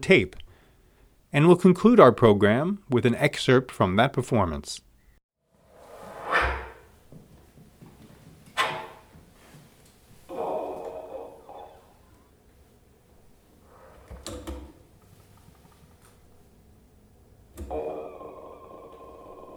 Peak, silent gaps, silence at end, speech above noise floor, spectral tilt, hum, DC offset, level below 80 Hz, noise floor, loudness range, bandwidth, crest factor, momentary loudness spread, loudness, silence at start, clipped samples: 0 dBFS; 5.23-5.29 s; 0 s; 39 dB; -6.5 dB/octave; none; under 0.1%; -48 dBFS; -59 dBFS; 26 LU; 17 kHz; 26 dB; 28 LU; -22 LUFS; 0 s; under 0.1%